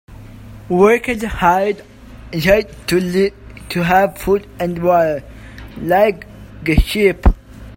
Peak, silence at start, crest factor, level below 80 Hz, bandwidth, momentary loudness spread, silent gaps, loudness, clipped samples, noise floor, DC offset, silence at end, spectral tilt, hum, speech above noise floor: 0 dBFS; 0.1 s; 16 dB; -26 dBFS; 16.5 kHz; 14 LU; none; -16 LUFS; under 0.1%; -35 dBFS; under 0.1%; 0.05 s; -6 dB/octave; none; 21 dB